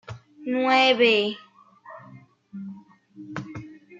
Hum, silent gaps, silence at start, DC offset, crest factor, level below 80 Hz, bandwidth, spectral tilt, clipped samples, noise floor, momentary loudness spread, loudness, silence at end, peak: none; none; 0.1 s; under 0.1%; 18 dB; -68 dBFS; 7.8 kHz; -4.5 dB/octave; under 0.1%; -50 dBFS; 26 LU; -20 LUFS; 0 s; -8 dBFS